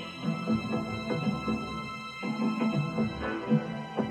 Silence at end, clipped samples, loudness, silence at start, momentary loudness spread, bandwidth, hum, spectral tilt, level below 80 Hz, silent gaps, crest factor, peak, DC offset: 0 s; under 0.1%; -31 LUFS; 0 s; 7 LU; 11 kHz; none; -7 dB/octave; -54 dBFS; none; 16 dB; -14 dBFS; under 0.1%